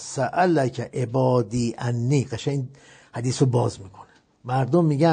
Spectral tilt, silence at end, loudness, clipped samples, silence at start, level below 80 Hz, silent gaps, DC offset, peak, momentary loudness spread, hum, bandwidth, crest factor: -6.5 dB/octave; 0 s; -23 LUFS; under 0.1%; 0 s; -56 dBFS; none; under 0.1%; -6 dBFS; 10 LU; none; 9.4 kHz; 16 dB